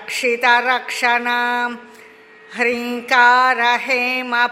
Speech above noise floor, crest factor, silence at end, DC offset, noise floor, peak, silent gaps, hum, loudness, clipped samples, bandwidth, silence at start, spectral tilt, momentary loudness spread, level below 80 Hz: 27 dB; 16 dB; 0 s; under 0.1%; -44 dBFS; 0 dBFS; none; none; -16 LUFS; under 0.1%; 16 kHz; 0 s; -1 dB/octave; 10 LU; -72 dBFS